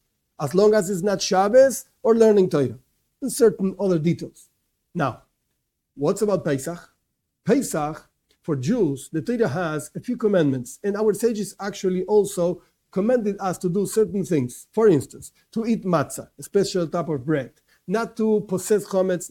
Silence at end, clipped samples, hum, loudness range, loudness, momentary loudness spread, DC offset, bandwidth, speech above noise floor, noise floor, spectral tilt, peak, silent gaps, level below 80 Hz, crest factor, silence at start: 0.05 s; under 0.1%; none; 6 LU; -22 LUFS; 13 LU; under 0.1%; 17 kHz; 54 dB; -76 dBFS; -6 dB/octave; -4 dBFS; none; -58 dBFS; 18 dB; 0.4 s